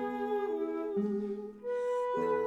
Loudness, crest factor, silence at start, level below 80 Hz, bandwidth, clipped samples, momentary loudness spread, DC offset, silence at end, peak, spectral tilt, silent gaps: -34 LUFS; 12 dB; 0 s; -72 dBFS; 12 kHz; under 0.1%; 6 LU; under 0.1%; 0 s; -22 dBFS; -7.5 dB/octave; none